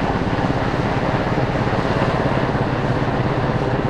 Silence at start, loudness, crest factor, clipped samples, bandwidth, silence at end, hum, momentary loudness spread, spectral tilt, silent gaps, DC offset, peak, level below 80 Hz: 0 s; -20 LUFS; 16 dB; under 0.1%; 9.8 kHz; 0 s; none; 1 LU; -7.5 dB/octave; none; under 0.1%; -4 dBFS; -32 dBFS